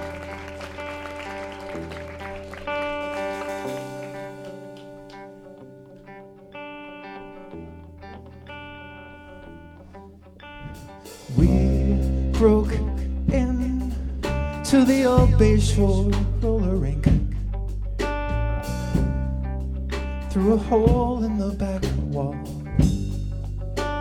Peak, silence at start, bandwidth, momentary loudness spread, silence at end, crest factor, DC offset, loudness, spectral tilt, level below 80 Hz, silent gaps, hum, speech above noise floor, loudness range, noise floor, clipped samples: -4 dBFS; 0 s; 14.5 kHz; 23 LU; 0 s; 20 dB; under 0.1%; -24 LUFS; -7 dB/octave; -28 dBFS; none; none; 25 dB; 20 LU; -44 dBFS; under 0.1%